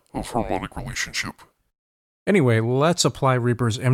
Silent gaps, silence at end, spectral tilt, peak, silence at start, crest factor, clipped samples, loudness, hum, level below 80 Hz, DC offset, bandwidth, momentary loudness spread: 1.79-2.26 s; 0 s; -5 dB/octave; -6 dBFS; 0.15 s; 16 dB; under 0.1%; -22 LUFS; none; -46 dBFS; under 0.1%; 15.5 kHz; 10 LU